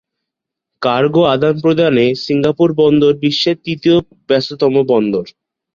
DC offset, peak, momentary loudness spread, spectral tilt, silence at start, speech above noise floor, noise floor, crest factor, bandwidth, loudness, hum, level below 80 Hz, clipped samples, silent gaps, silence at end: under 0.1%; -2 dBFS; 6 LU; -7 dB/octave; 0.8 s; 68 dB; -81 dBFS; 12 dB; 7.4 kHz; -13 LUFS; none; -50 dBFS; under 0.1%; none; 0.45 s